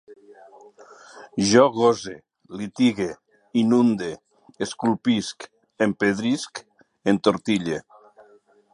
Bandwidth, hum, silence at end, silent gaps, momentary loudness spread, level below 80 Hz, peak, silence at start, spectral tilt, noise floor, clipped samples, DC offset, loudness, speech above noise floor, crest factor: 11 kHz; none; 0.95 s; none; 20 LU; -62 dBFS; -2 dBFS; 0.1 s; -5 dB/octave; -56 dBFS; under 0.1%; under 0.1%; -22 LUFS; 34 dB; 22 dB